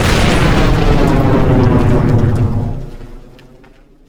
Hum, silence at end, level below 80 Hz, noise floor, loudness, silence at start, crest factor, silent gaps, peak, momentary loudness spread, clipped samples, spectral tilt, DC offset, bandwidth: none; 0 s; -18 dBFS; -42 dBFS; -12 LUFS; 0 s; 12 dB; none; 0 dBFS; 9 LU; under 0.1%; -6.5 dB/octave; under 0.1%; 19.5 kHz